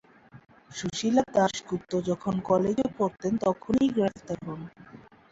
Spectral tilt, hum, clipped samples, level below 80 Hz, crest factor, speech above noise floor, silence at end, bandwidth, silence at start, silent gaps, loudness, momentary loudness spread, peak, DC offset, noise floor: -6 dB/octave; none; under 0.1%; -58 dBFS; 18 dB; 24 dB; 0.35 s; 8 kHz; 0.35 s; none; -27 LUFS; 12 LU; -10 dBFS; under 0.1%; -51 dBFS